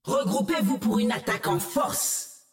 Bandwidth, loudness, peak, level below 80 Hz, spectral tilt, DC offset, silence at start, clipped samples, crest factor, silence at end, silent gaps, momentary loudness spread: 17 kHz; -26 LUFS; -16 dBFS; -60 dBFS; -4 dB/octave; under 0.1%; 0.05 s; under 0.1%; 10 dB; 0.15 s; none; 2 LU